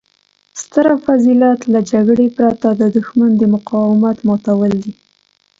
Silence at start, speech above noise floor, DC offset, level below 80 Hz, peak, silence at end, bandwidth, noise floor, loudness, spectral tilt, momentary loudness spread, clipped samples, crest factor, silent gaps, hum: 0.55 s; 46 dB; under 0.1%; -54 dBFS; 0 dBFS; 0.7 s; 7.8 kHz; -58 dBFS; -13 LUFS; -7.5 dB/octave; 6 LU; under 0.1%; 12 dB; none; 50 Hz at -40 dBFS